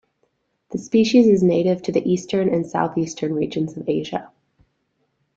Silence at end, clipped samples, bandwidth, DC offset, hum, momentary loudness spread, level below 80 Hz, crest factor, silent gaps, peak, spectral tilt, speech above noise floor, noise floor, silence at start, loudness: 1.1 s; under 0.1%; 8 kHz; under 0.1%; none; 12 LU; -60 dBFS; 18 dB; none; -4 dBFS; -6.5 dB/octave; 51 dB; -70 dBFS; 0.7 s; -20 LUFS